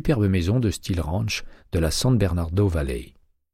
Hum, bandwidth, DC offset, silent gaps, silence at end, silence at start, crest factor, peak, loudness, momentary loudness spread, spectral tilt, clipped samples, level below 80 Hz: none; 15.5 kHz; under 0.1%; none; 0.5 s; 0 s; 14 dB; -8 dBFS; -23 LUFS; 9 LU; -6 dB/octave; under 0.1%; -34 dBFS